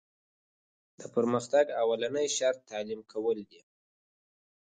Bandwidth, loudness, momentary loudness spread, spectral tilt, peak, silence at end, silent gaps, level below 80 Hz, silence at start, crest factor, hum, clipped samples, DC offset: 9.6 kHz; -30 LUFS; 11 LU; -3.5 dB/octave; -12 dBFS; 1.25 s; none; -80 dBFS; 1 s; 20 dB; none; under 0.1%; under 0.1%